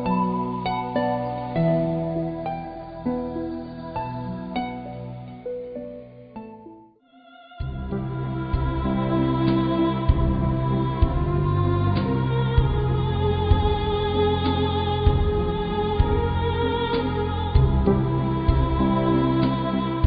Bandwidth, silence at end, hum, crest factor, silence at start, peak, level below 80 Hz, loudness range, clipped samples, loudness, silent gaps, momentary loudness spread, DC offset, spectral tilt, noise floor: 5 kHz; 0 s; none; 18 dB; 0 s; -6 dBFS; -30 dBFS; 11 LU; under 0.1%; -24 LUFS; none; 12 LU; under 0.1%; -12 dB/octave; -52 dBFS